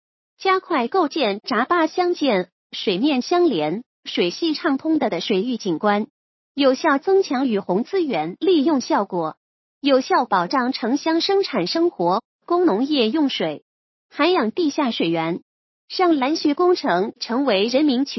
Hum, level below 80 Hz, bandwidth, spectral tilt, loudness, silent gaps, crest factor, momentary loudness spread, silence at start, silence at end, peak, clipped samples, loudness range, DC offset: none; -76 dBFS; 6.2 kHz; -5 dB/octave; -20 LUFS; 2.52-2.70 s, 3.86-4.03 s, 6.10-6.55 s, 9.37-9.81 s, 12.25-12.39 s, 13.62-14.09 s, 15.42-15.88 s; 16 dB; 7 LU; 0.4 s; 0 s; -4 dBFS; under 0.1%; 1 LU; under 0.1%